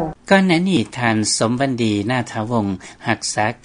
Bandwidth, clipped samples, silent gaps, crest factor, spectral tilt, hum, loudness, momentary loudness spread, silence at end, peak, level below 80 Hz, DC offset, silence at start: 11 kHz; under 0.1%; none; 18 dB; -4.5 dB/octave; none; -18 LUFS; 7 LU; 0.1 s; 0 dBFS; -50 dBFS; under 0.1%; 0 s